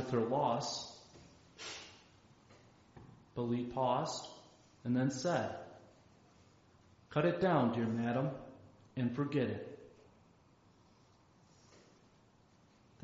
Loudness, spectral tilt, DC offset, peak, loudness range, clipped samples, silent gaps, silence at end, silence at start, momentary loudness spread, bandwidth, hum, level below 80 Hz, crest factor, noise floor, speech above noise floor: -37 LUFS; -5.5 dB/octave; under 0.1%; -20 dBFS; 7 LU; under 0.1%; none; 3.15 s; 0 s; 23 LU; 7.6 kHz; none; -72 dBFS; 20 dB; -67 dBFS; 32 dB